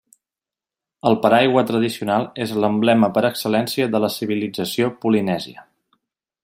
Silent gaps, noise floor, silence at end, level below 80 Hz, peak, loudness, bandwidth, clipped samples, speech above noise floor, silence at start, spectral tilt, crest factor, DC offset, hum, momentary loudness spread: none; -89 dBFS; 0.8 s; -62 dBFS; -2 dBFS; -19 LUFS; 16 kHz; under 0.1%; 71 dB; 1.05 s; -5.5 dB/octave; 18 dB; under 0.1%; none; 8 LU